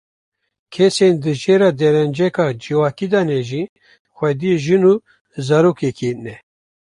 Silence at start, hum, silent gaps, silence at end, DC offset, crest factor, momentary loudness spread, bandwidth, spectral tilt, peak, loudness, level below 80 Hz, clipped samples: 0.7 s; none; 3.69-3.76 s, 3.99-4.05 s, 5.21-5.25 s; 0.55 s; under 0.1%; 14 dB; 13 LU; 11 kHz; -6.5 dB/octave; -2 dBFS; -16 LUFS; -58 dBFS; under 0.1%